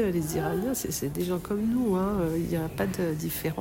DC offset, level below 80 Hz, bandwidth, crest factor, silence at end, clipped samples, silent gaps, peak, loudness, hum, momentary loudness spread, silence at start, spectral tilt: under 0.1%; -46 dBFS; 16.5 kHz; 14 dB; 0 s; under 0.1%; none; -14 dBFS; -29 LUFS; none; 4 LU; 0 s; -6 dB/octave